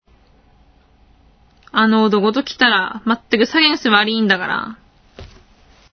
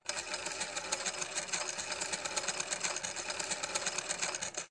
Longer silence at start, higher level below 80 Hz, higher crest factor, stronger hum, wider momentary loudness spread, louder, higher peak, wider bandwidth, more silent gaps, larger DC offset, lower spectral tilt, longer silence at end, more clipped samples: first, 1.75 s vs 0.05 s; first, -52 dBFS vs -70 dBFS; about the same, 18 dB vs 22 dB; neither; first, 9 LU vs 3 LU; first, -15 LUFS vs -35 LUFS; first, 0 dBFS vs -16 dBFS; second, 6.6 kHz vs 11.5 kHz; neither; neither; first, -5 dB/octave vs 0 dB/octave; first, 0.65 s vs 0 s; neither